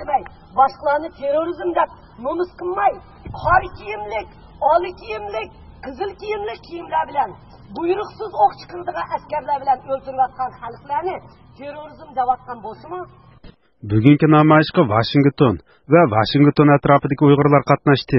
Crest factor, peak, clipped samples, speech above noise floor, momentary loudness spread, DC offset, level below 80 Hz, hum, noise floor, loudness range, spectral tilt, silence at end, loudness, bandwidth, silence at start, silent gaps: 18 dB; 0 dBFS; under 0.1%; 27 dB; 19 LU; under 0.1%; -46 dBFS; none; -45 dBFS; 11 LU; -9.5 dB/octave; 0 s; -18 LUFS; 6 kHz; 0 s; none